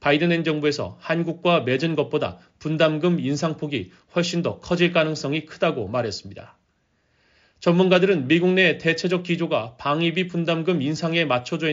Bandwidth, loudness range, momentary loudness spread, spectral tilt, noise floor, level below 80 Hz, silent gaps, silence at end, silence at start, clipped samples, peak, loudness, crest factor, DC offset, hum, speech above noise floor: 7.6 kHz; 4 LU; 10 LU; -4.5 dB/octave; -67 dBFS; -60 dBFS; none; 0 s; 0 s; under 0.1%; -4 dBFS; -22 LUFS; 18 dB; under 0.1%; none; 46 dB